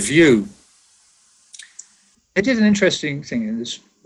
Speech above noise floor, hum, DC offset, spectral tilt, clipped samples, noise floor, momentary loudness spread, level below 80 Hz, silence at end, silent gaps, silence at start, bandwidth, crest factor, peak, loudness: 41 dB; none; under 0.1%; -4.5 dB/octave; under 0.1%; -58 dBFS; 24 LU; -52 dBFS; 0.3 s; none; 0 s; 12 kHz; 18 dB; -2 dBFS; -18 LUFS